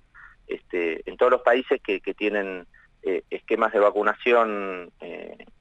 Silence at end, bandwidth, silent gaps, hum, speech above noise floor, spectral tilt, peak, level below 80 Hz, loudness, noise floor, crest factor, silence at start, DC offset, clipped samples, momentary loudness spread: 0.15 s; 8 kHz; none; none; 25 dB; -5.5 dB/octave; -6 dBFS; -60 dBFS; -24 LUFS; -49 dBFS; 18 dB; 0.15 s; under 0.1%; under 0.1%; 18 LU